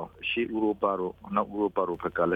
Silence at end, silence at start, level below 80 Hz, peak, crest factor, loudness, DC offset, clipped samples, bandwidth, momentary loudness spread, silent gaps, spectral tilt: 0 s; 0 s; -60 dBFS; -12 dBFS; 16 dB; -29 LUFS; under 0.1%; under 0.1%; 4.8 kHz; 3 LU; none; -8 dB/octave